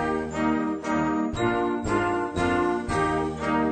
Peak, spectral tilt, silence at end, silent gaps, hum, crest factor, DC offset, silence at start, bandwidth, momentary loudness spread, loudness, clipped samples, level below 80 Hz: -12 dBFS; -6 dB/octave; 0 s; none; none; 14 dB; under 0.1%; 0 s; 9.4 kHz; 2 LU; -25 LUFS; under 0.1%; -44 dBFS